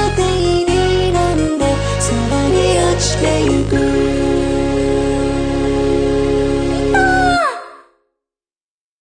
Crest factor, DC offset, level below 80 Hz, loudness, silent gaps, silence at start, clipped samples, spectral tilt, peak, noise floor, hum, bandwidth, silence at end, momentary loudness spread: 12 dB; under 0.1%; -26 dBFS; -15 LUFS; none; 0 s; under 0.1%; -5 dB/octave; -2 dBFS; under -90 dBFS; none; 10.5 kHz; 1.25 s; 4 LU